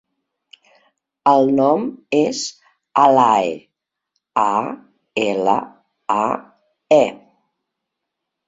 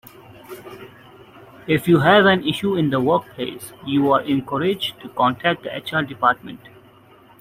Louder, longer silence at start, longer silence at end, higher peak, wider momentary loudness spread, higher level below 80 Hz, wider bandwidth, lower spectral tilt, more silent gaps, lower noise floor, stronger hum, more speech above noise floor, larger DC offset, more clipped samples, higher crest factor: about the same, -18 LUFS vs -19 LUFS; first, 1.25 s vs 0.5 s; first, 1.35 s vs 0.85 s; about the same, 0 dBFS vs -2 dBFS; second, 14 LU vs 24 LU; second, -64 dBFS vs -56 dBFS; second, 8 kHz vs 16 kHz; about the same, -5 dB/octave vs -6 dB/octave; neither; first, -80 dBFS vs -49 dBFS; neither; first, 64 dB vs 30 dB; neither; neither; about the same, 18 dB vs 18 dB